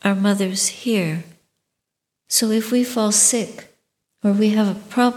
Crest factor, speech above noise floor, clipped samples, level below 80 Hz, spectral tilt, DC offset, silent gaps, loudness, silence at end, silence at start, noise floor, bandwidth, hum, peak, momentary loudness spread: 20 dB; 62 dB; under 0.1%; -70 dBFS; -3.5 dB/octave; under 0.1%; none; -18 LUFS; 0 s; 0.05 s; -81 dBFS; 17 kHz; none; 0 dBFS; 10 LU